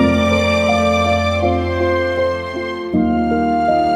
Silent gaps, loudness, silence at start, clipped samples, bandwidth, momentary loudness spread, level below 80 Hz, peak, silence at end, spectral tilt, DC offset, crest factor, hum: none; -16 LUFS; 0 s; under 0.1%; 13.5 kHz; 5 LU; -34 dBFS; -2 dBFS; 0 s; -6 dB/octave; under 0.1%; 14 dB; none